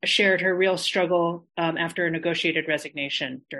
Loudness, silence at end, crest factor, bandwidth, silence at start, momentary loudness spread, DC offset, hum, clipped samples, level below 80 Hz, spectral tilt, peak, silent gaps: -24 LUFS; 0 s; 16 dB; 12.5 kHz; 0.05 s; 8 LU; under 0.1%; none; under 0.1%; -72 dBFS; -4 dB/octave; -8 dBFS; none